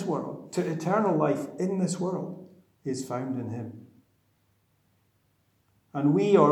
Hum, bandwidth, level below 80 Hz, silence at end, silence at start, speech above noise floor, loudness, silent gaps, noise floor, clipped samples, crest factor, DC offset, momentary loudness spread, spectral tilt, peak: none; 14 kHz; -78 dBFS; 0 s; 0 s; 43 dB; -28 LUFS; none; -69 dBFS; under 0.1%; 22 dB; under 0.1%; 15 LU; -7 dB/octave; -6 dBFS